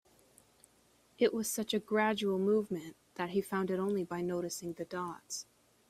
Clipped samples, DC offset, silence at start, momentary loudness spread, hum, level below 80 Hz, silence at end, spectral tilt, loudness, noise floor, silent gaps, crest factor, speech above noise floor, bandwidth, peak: under 0.1%; under 0.1%; 1.2 s; 11 LU; none; -74 dBFS; 0.45 s; -4.5 dB/octave; -35 LUFS; -68 dBFS; none; 18 dB; 34 dB; 16 kHz; -16 dBFS